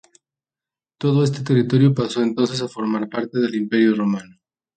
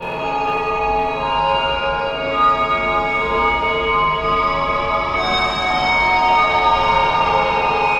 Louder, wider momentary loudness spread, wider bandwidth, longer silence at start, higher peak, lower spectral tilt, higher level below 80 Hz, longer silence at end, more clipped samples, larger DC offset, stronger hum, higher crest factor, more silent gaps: second, -20 LUFS vs -17 LUFS; first, 8 LU vs 5 LU; about the same, 9.2 kHz vs 10 kHz; first, 1 s vs 0 s; about the same, -4 dBFS vs -4 dBFS; first, -7 dB/octave vs -4.5 dB/octave; second, -62 dBFS vs -36 dBFS; first, 0.55 s vs 0 s; neither; neither; neither; about the same, 16 dB vs 14 dB; neither